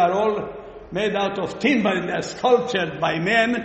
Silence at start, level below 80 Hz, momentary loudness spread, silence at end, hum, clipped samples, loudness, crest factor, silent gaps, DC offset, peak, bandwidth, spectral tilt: 0 s; -54 dBFS; 10 LU; 0 s; none; under 0.1%; -22 LUFS; 16 dB; none; under 0.1%; -4 dBFS; 8.4 kHz; -5 dB/octave